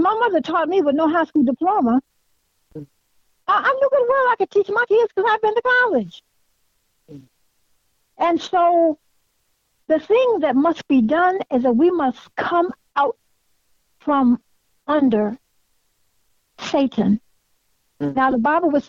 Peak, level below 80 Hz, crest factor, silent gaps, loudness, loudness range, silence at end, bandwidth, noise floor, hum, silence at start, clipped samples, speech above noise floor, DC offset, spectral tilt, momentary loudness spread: -8 dBFS; -60 dBFS; 12 dB; none; -19 LUFS; 5 LU; 0.05 s; 7.4 kHz; -67 dBFS; none; 0 s; under 0.1%; 49 dB; under 0.1%; -6.5 dB/octave; 9 LU